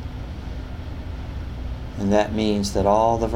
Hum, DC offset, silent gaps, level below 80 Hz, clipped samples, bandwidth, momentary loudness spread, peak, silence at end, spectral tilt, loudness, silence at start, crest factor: none; under 0.1%; none; -34 dBFS; under 0.1%; 16 kHz; 15 LU; -4 dBFS; 0 s; -6 dB/octave; -24 LUFS; 0 s; 18 dB